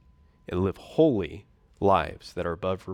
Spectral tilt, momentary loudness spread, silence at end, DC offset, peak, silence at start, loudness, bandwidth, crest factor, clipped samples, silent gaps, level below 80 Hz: -7.5 dB/octave; 11 LU; 0 s; under 0.1%; -8 dBFS; 0.5 s; -27 LUFS; 12 kHz; 18 dB; under 0.1%; none; -50 dBFS